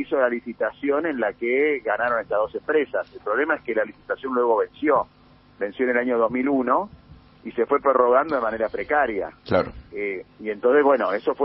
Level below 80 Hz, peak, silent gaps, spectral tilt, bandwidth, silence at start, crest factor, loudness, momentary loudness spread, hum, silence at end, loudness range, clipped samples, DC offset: -56 dBFS; -4 dBFS; none; -4 dB/octave; 5.6 kHz; 0 s; 18 dB; -23 LUFS; 12 LU; 50 Hz at -60 dBFS; 0 s; 2 LU; under 0.1%; under 0.1%